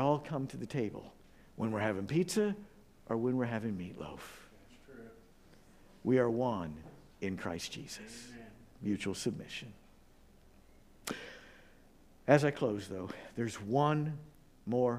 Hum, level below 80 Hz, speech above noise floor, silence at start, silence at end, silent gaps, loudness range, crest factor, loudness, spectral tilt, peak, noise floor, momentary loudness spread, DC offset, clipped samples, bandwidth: none; -64 dBFS; 27 dB; 0 s; 0 s; none; 8 LU; 26 dB; -36 LUFS; -6 dB/octave; -10 dBFS; -61 dBFS; 21 LU; under 0.1%; under 0.1%; 15.5 kHz